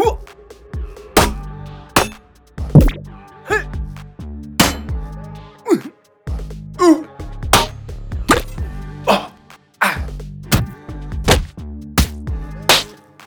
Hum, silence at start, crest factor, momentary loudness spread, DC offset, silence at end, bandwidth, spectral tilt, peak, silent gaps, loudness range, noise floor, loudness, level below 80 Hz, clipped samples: none; 0 s; 18 dB; 19 LU; under 0.1%; 0 s; over 20 kHz; -4.5 dB/octave; 0 dBFS; none; 3 LU; -46 dBFS; -17 LUFS; -28 dBFS; under 0.1%